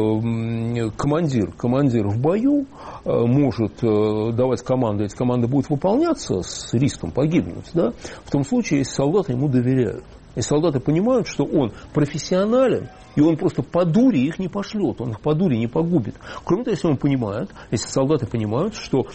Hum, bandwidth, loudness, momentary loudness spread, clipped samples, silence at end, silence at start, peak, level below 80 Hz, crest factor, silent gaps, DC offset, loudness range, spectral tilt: none; 8.8 kHz; -21 LUFS; 7 LU; under 0.1%; 0 s; 0 s; -6 dBFS; -46 dBFS; 14 dB; none; under 0.1%; 2 LU; -7 dB/octave